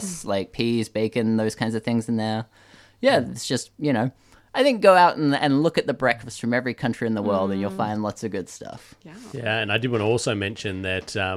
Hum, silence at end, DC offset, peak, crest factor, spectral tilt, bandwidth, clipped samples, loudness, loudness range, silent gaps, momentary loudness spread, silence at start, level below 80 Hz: none; 0 s; under 0.1%; -4 dBFS; 20 dB; -5 dB/octave; 14.5 kHz; under 0.1%; -23 LUFS; 6 LU; none; 12 LU; 0 s; -58 dBFS